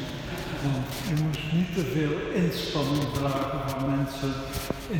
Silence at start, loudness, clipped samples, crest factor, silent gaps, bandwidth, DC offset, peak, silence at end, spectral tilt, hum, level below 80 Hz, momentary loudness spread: 0 s; -28 LUFS; under 0.1%; 16 dB; none; over 20 kHz; under 0.1%; -12 dBFS; 0 s; -6 dB/octave; none; -44 dBFS; 6 LU